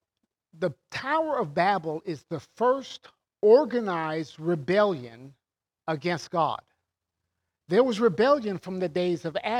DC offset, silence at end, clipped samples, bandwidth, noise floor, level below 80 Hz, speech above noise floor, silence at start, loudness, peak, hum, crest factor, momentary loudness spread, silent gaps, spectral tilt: under 0.1%; 0 s; under 0.1%; 11 kHz; -84 dBFS; -72 dBFS; 58 dB; 0.6 s; -26 LUFS; -8 dBFS; none; 20 dB; 14 LU; none; -6.5 dB/octave